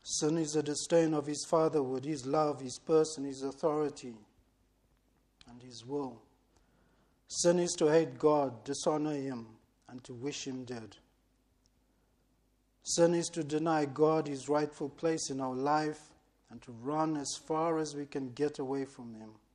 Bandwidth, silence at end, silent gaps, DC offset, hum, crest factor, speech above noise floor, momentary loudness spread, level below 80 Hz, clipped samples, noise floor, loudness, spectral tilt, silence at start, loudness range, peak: 11.5 kHz; 0.2 s; none; under 0.1%; none; 18 dB; 40 dB; 17 LU; -72 dBFS; under 0.1%; -73 dBFS; -33 LUFS; -4.5 dB/octave; 0.05 s; 11 LU; -16 dBFS